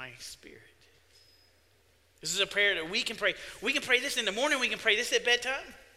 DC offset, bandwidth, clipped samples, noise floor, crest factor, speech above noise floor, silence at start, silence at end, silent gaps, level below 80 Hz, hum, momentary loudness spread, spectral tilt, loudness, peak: under 0.1%; 16 kHz; under 0.1%; -66 dBFS; 22 dB; 36 dB; 0 s; 0.15 s; none; -66 dBFS; none; 14 LU; -0.5 dB/octave; -28 LUFS; -10 dBFS